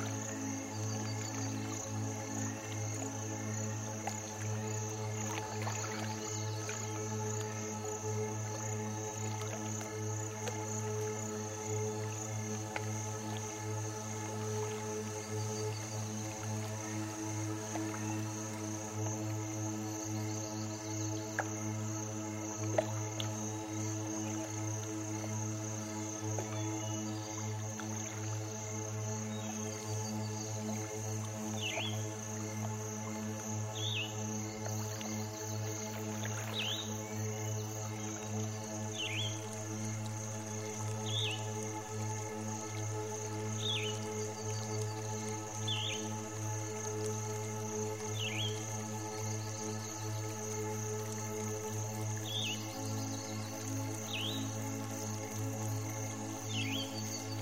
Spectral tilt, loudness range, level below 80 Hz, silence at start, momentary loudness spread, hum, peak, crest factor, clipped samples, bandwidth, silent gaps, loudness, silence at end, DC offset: -4 dB/octave; 1 LU; -70 dBFS; 0 s; 4 LU; none; -18 dBFS; 20 dB; under 0.1%; 16 kHz; none; -39 LUFS; 0 s; under 0.1%